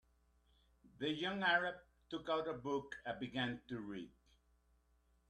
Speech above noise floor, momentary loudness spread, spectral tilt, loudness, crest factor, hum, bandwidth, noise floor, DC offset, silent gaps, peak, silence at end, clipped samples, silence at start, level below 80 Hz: 35 dB; 15 LU; -5.5 dB/octave; -41 LUFS; 22 dB; none; 11.5 kHz; -75 dBFS; under 0.1%; none; -22 dBFS; 1.2 s; under 0.1%; 0.85 s; -72 dBFS